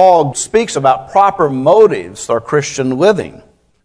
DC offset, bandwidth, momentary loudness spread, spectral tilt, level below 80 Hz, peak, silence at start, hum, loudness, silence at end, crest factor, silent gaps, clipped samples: under 0.1%; 11 kHz; 9 LU; -5 dB/octave; -48 dBFS; 0 dBFS; 0 s; none; -12 LUFS; 0.55 s; 12 dB; none; 0.6%